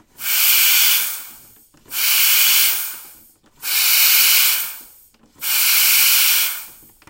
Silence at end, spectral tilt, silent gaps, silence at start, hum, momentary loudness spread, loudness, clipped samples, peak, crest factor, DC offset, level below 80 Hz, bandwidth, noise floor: 0.4 s; 4.5 dB/octave; none; 0.2 s; none; 16 LU; -12 LUFS; under 0.1%; 0 dBFS; 18 dB; under 0.1%; -64 dBFS; 16.5 kHz; -50 dBFS